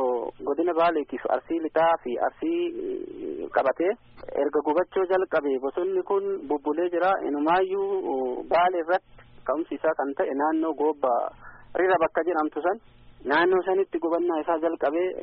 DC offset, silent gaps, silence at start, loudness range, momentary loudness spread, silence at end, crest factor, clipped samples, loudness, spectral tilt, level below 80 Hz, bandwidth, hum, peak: under 0.1%; none; 0 s; 2 LU; 7 LU; 0 s; 16 dB; under 0.1%; -26 LUFS; -3 dB/octave; -60 dBFS; 5 kHz; none; -8 dBFS